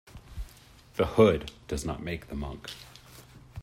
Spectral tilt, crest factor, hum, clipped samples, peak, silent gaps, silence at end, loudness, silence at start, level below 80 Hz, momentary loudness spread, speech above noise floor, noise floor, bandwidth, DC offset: -6 dB/octave; 22 dB; none; under 0.1%; -8 dBFS; none; 0 s; -29 LUFS; 0.15 s; -46 dBFS; 25 LU; 26 dB; -54 dBFS; 16 kHz; under 0.1%